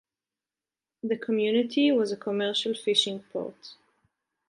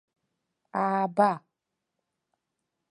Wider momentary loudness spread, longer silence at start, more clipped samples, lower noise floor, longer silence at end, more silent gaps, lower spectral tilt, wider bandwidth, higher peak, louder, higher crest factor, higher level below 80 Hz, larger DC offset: about the same, 12 LU vs 12 LU; first, 1.05 s vs 0.75 s; neither; first, under -90 dBFS vs -84 dBFS; second, 0.75 s vs 1.5 s; neither; second, -4 dB/octave vs -7.5 dB/octave; about the same, 11 kHz vs 11 kHz; about the same, -8 dBFS vs -10 dBFS; about the same, -26 LUFS vs -27 LUFS; about the same, 20 dB vs 22 dB; about the same, -80 dBFS vs -82 dBFS; neither